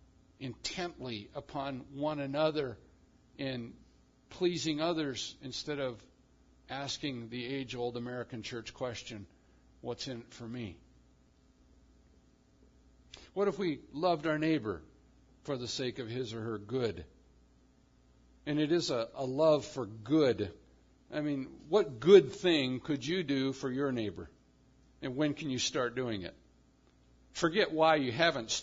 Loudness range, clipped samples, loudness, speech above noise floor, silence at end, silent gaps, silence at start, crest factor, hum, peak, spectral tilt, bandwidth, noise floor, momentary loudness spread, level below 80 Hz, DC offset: 13 LU; under 0.1%; -33 LUFS; 33 dB; 0 s; none; 0.4 s; 26 dB; none; -8 dBFS; -4 dB/octave; 7.4 kHz; -65 dBFS; 16 LU; -66 dBFS; under 0.1%